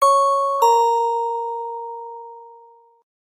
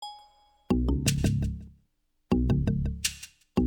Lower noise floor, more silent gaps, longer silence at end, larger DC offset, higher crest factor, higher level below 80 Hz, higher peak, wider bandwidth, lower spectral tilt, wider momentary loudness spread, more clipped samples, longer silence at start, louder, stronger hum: second, -49 dBFS vs -72 dBFS; neither; first, 0.7 s vs 0 s; neither; about the same, 16 dB vs 20 dB; second, -88 dBFS vs -36 dBFS; first, -4 dBFS vs -10 dBFS; second, 15.5 kHz vs 19 kHz; second, 2 dB/octave vs -5.5 dB/octave; first, 20 LU vs 13 LU; neither; about the same, 0 s vs 0 s; first, -19 LUFS vs -28 LUFS; neither